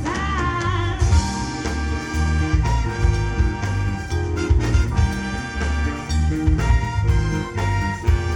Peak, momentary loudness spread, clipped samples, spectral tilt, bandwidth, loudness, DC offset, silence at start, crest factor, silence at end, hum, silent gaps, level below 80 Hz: -6 dBFS; 6 LU; under 0.1%; -6 dB/octave; 11.5 kHz; -21 LUFS; under 0.1%; 0 s; 14 dB; 0 s; none; none; -24 dBFS